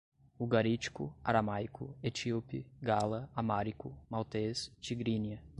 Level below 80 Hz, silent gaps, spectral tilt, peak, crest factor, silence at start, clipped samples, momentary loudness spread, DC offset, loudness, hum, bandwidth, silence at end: -62 dBFS; none; -6 dB/octave; -14 dBFS; 22 dB; 0.4 s; under 0.1%; 9 LU; under 0.1%; -36 LUFS; none; 11 kHz; 0 s